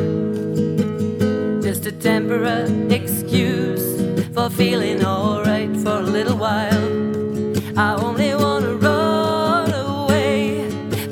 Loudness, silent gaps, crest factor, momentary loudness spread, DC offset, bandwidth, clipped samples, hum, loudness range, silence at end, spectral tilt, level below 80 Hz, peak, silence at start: -19 LUFS; none; 16 dB; 4 LU; under 0.1%; 19.5 kHz; under 0.1%; none; 1 LU; 0 s; -6 dB/octave; -54 dBFS; -2 dBFS; 0 s